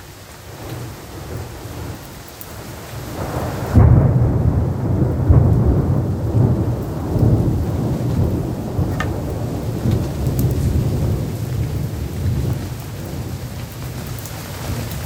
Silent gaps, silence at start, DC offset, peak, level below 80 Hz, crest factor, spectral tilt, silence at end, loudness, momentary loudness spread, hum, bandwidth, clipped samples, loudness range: none; 0 s; under 0.1%; 0 dBFS; -28 dBFS; 18 dB; -7.5 dB/octave; 0 s; -19 LUFS; 17 LU; none; 18 kHz; under 0.1%; 9 LU